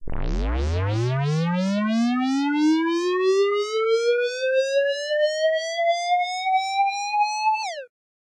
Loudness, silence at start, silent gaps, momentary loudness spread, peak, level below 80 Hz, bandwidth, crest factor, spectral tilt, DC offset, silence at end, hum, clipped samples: -22 LUFS; 0 s; none; 5 LU; -12 dBFS; -36 dBFS; 11.5 kHz; 10 dB; -5.5 dB/octave; under 0.1%; 0.4 s; none; under 0.1%